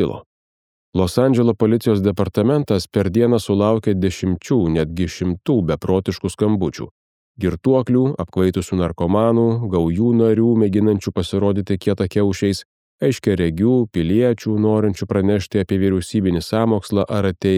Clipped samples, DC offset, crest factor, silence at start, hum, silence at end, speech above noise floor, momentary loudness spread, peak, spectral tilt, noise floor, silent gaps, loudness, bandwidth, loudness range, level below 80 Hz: under 0.1%; under 0.1%; 16 dB; 0 s; none; 0 s; over 73 dB; 6 LU; -2 dBFS; -7.5 dB/octave; under -90 dBFS; 0.26-0.93 s, 6.91-7.35 s, 12.65-12.98 s; -18 LUFS; 15 kHz; 3 LU; -42 dBFS